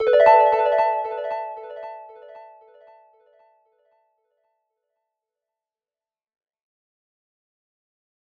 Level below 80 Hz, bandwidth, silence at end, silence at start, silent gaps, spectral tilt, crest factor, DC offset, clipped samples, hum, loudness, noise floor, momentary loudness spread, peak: -66 dBFS; 6.6 kHz; 5.9 s; 0 s; none; -3.5 dB/octave; 24 dB; under 0.1%; under 0.1%; none; -18 LUFS; under -90 dBFS; 23 LU; -2 dBFS